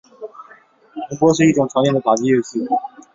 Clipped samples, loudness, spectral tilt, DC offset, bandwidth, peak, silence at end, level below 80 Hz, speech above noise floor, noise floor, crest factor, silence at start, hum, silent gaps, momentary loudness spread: under 0.1%; -17 LUFS; -6 dB/octave; under 0.1%; 7.8 kHz; -2 dBFS; 0.25 s; -58 dBFS; 33 dB; -48 dBFS; 16 dB; 0.2 s; none; none; 22 LU